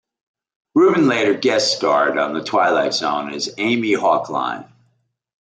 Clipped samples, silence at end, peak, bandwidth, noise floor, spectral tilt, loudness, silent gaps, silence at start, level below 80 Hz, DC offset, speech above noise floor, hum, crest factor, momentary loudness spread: under 0.1%; 0.75 s; -4 dBFS; 9.4 kHz; -66 dBFS; -4 dB/octave; -18 LUFS; none; 0.75 s; -66 dBFS; under 0.1%; 49 dB; none; 14 dB; 8 LU